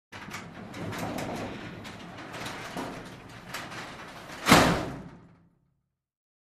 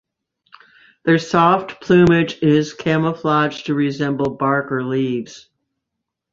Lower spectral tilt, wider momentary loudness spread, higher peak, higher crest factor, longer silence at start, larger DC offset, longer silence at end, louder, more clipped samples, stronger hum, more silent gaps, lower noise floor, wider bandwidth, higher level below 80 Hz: second, -4 dB/octave vs -7 dB/octave; first, 22 LU vs 7 LU; second, -4 dBFS vs 0 dBFS; first, 28 dB vs 18 dB; second, 0.1 s vs 1.05 s; neither; first, 1.2 s vs 0.95 s; second, -29 LUFS vs -17 LUFS; neither; neither; neither; about the same, -77 dBFS vs -80 dBFS; first, 15.5 kHz vs 7.6 kHz; about the same, -52 dBFS vs -52 dBFS